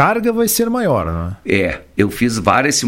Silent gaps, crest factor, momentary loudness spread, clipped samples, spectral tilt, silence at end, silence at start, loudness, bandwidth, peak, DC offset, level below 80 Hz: none; 16 dB; 5 LU; under 0.1%; -4.5 dB/octave; 0 s; 0 s; -16 LUFS; 16.5 kHz; 0 dBFS; under 0.1%; -38 dBFS